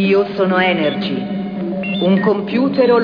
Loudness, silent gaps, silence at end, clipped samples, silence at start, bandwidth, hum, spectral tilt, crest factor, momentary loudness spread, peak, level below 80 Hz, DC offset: -16 LUFS; none; 0 s; under 0.1%; 0 s; 5.2 kHz; none; -8.5 dB/octave; 14 dB; 8 LU; -2 dBFS; -54 dBFS; under 0.1%